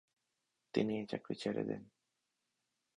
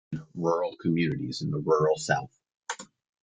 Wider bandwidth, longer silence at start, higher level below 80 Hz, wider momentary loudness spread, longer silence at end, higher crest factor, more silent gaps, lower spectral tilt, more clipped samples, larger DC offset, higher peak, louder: about the same, 10 kHz vs 9.4 kHz; first, 0.75 s vs 0.1 s; second, -76 dBFS vs -64 dBFS; second, 6 LU vs 15 LU; first, 1.1 s vs 0.4 s; about the same, 24 dB vs 20 dB; neither; about the same, -6.5 dB/octave vs -5.5 dB/octave; neither; neither; second, -18 dBFS vs -10 dBFS; second, -40 LUFS vs -28 LUFS